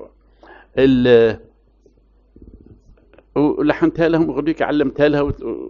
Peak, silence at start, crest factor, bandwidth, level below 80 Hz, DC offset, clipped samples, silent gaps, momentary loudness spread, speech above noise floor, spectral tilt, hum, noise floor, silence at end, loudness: -2 dBFS; 0 s; 18 dB; 6.8 kHz; -42 dBFS; under 0.1%; under 0.1%; none; 10 LU; 38 dB; -5.5 dB/octave; none; -54 dBFS; 0 s; -16 LUFS